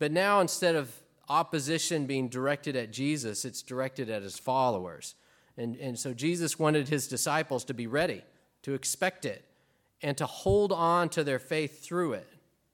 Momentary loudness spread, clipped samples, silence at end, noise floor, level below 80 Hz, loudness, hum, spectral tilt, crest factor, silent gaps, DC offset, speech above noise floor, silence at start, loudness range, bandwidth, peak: 13 LU; under 0.1%; 0.5 s; -70 dBFS; -58 dBFS; -30 LUFS; none; -4 dB/octave; 18 dB; none; under 0.1%; 40 dB; 0 s; 3 LU; 17.5 kHz; -12 dBFS